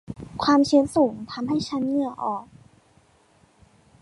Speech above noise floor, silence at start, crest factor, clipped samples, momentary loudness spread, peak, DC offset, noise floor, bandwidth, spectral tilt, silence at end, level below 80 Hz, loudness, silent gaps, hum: 37 dB; 0.1 s; 18 dB; under 0.1%; 13 LU; -6 dBFS; under 0.1%; -59 dBFS; 11.5 kHz; -5.5 dB/octave; 1.6 s; -56 dBFS; -23 LUFS; none; none